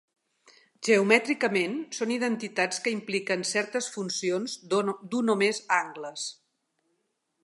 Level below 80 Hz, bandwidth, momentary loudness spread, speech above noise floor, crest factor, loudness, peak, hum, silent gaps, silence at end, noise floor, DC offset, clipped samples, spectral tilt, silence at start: -80 dBFS; 11.5 kHz; 10 LU; 50 dB; 24 dB; -27 LUFS; -6 dBFS; none; none; 1.1 s; -77 dBFS; under 0.1%; under 0.1%; -3.5 dB/octave; 0.8 s